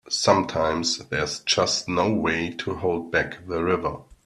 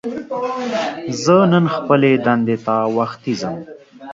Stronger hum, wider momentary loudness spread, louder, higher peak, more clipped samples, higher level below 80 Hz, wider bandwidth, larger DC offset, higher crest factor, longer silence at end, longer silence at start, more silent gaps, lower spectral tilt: neither; second, 7 LU vs 11 LU; second, -24 LUFS vs -17 LUFS; about the same, -2 dBFS vs 0 dBFS; neither; first, -52 dBFS vs -60 dBFS; first, 12.5 kHz vs 7.8 kHz; neither; first, 22 dB vs 16 dB; about the same, 0.1 s vs 0 s; about the same, 0.05 s vs 0.05 s; neither; second, -3.5 dB/octave vs -6.5 dB/octave